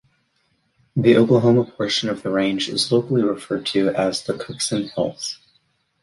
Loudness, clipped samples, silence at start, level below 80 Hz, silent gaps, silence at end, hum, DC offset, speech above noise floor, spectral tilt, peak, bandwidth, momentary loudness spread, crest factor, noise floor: -20 LUFS; under 0.1%; 0.95 s; -58 dBFS; none; 0.7 s; none; under 0.1%; 47 dB; -5 dB/octave; -2 dBFS; 11.5 kHz; 11 LU; 18 dB; -66 dBFS